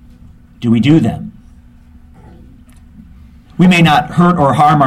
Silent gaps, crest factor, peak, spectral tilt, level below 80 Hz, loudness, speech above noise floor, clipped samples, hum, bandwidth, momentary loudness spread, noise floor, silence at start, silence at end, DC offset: none; 14 dB; 0 dBFS; -7 dB/octave; -40 dBFS; -11 LUFS; 31 dB; under 0.1%; none; 13 kHz; 17 LU; -40 dBFS; 0.6 s; 0 s; under 0.1%